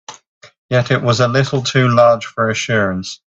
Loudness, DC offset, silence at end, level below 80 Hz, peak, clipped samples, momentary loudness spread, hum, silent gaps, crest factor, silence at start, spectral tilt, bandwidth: -15 LUFS; under 0.1%; 0.2 s; -52 dBFS; 0 dBFS; under 0.1%; 7 LU; none; 0.27-0.41 s, 0.58-0.69 s; 16 dB; 0.1 s; -5.5 dB/octave; 8 kHz